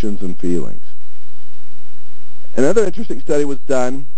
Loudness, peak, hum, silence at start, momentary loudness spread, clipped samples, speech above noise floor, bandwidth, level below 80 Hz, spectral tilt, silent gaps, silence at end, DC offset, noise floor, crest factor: -20 LUFS; 0 dBFS; none; 0 s; 11 LU; under 0.1%; 35 dB; 8 kHz; -52 dBFS; -6.5 dB/octave; none; 0 s; 40%; -54 dBFS; 18 dB